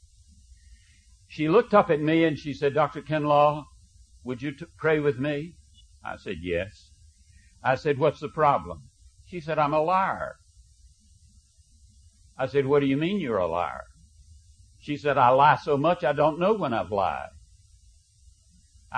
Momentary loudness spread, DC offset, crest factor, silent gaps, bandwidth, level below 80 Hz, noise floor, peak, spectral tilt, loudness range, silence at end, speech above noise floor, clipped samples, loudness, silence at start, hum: 18 LU; under 0.1%; 22 dB; none; 9.8 kHz; -56 dBFS; -58 dBFS; -6 dBFS; -7 dB/octave; 6 LU; 0 s; 33 dB; under 0.1%; -25 LUFS; 1.3 s; none